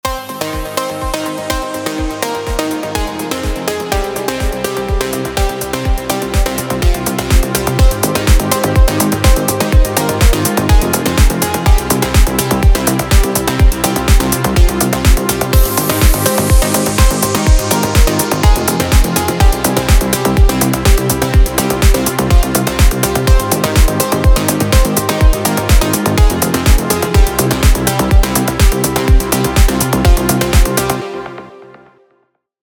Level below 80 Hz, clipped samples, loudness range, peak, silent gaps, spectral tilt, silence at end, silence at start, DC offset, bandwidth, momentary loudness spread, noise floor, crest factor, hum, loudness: -14 dBFS; under 0.1%; 5 LU; 0 dBFS; none; -4.5 dB/octave; 1 s; 0.05 s; under 0.1%; over 20 kHz; 7 LU; -60 dBFS; 12 dB; none; -13 LUFS